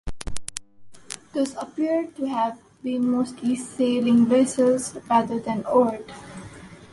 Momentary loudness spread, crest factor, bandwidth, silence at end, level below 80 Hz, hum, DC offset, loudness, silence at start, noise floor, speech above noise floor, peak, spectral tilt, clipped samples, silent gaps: 19 LU; 20 dB; 11.5 kHz; 0.05 s; -48 dBFS; none; under 0.1%; -23 LUFS; 0.05 s; -47 dBFS; 25 dB; -4 dBFS; -5 dB/octave; under 0.1%; none